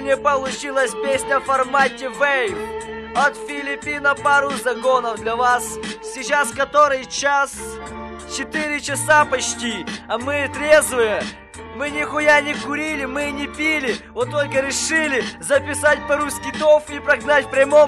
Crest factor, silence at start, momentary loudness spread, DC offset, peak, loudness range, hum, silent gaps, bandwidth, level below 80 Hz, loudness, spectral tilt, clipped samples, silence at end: 16 dB; 0 s; 12 LU; under 0.1%; -4 dBFS; 2 LU; none; none; 13.5 kHz; -48 dBFS; -19 LUFS; -2.5 dB/octave; under 0.1%; 0 s